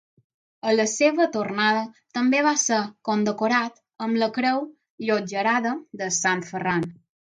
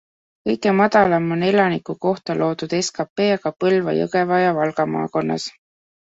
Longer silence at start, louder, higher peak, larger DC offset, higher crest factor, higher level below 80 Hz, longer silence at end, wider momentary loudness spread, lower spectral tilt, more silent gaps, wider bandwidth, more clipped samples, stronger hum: first, 0.65 s vs 0.45 s; second, -23 LUFS vs -19 LUFS; second, -6 dBFS vs -2 dBFS; neither; about the same, 18 dB vs 16 dB; second, -70 dBFS vs -60 dBFS; second, 0.35 s vs 0.55 s; about the same, 10 LU vs 8 LU; second, -3.5 dB/octave vs -5.5 dB/octave; about the same, 4.90-4.98 s vs 3.10-3.16 s; first, 9.6 kHz vs 8 kHz; neither; neither